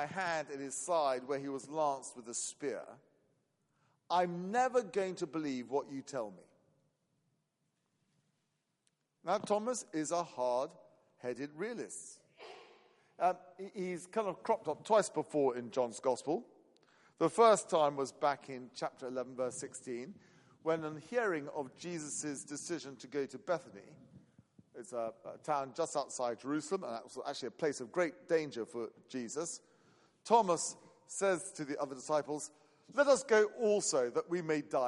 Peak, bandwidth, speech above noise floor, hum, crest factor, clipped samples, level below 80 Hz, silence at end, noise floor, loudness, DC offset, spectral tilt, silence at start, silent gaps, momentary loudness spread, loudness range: -14 dBFS; 11.5 kHz; 47 dB; none; 22 dB; under 0.1%; -86 dBFS; 0 s; -83 dBFS; -36 LUFS; under 0.1%; -4 dB/octave; 0 s; none; 14 LU; 9 LU